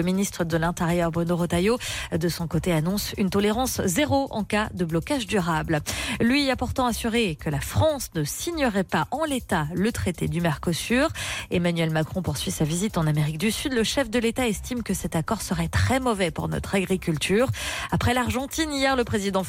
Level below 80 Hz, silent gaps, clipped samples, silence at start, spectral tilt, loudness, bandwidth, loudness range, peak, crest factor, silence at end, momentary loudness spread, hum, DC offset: -42 dBFS; none; under 0.1%; 0 s; -5 dB/octave; -25 LUFS; 16.5 kHz; 1 LU; -12 dBFS; 12 dB; 0 s; 4 LU; none; under 0.1%